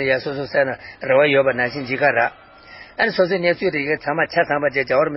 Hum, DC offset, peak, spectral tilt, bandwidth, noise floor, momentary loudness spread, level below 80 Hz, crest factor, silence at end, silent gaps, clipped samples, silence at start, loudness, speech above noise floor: none; under 0.1%; -2 dBFS; -9.5 dB/octave; 5.8 kHz; -42 dBFS; 6 LU; -56 dBFS; 18 dB; 0 s; none; under 0.1%; 0 s; -19 LUFS; 23 dB